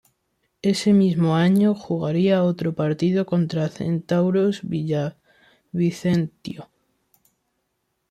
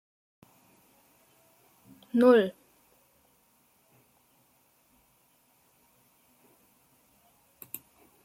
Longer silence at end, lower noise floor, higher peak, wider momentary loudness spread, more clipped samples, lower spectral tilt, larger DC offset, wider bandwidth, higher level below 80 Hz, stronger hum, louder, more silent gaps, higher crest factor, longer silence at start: second, 1.45 s vs 5.75 s; first, -74 dBFS vs -67 dBFS; about the same, -8 dBFS vs -10 dBFS; second, 10 LU vs 23 LU; neither; first, -7.5 dB/octave vs -5.5 dB/octave; neither; second, 12.5 kHz vs 16.5 kHz; first, -60 dBFS vs -80 dBFS; neither; first, -21 LUFS vs -25 LUFS; neither; second, 14 dB vs 24 dB; second, 0.65 s vs 2.15 s